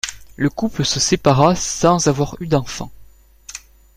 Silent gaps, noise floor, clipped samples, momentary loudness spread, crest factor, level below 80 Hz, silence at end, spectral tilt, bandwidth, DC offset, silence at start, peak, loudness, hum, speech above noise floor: none; -45 dBFS; under 0.1%; 20 LU; 18 dB; -40 dBFS; 0.4 s; -4.5 dB/octave; 15 kHz; under 0.1%; 0.05 s; -2 dBFS; -17 LUFS; none; 28 dB